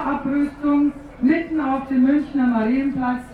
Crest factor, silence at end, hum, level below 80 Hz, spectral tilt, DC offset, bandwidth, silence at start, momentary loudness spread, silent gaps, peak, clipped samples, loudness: 14 dB; 0 s; 50 Hz at -50 dBFS; -46 dBFS; -8 dB/octave; under 0.1%; 4.8 kHz; 0 s; 5 LU; none; -6 dBFS; under 0.1%; -20 LUFS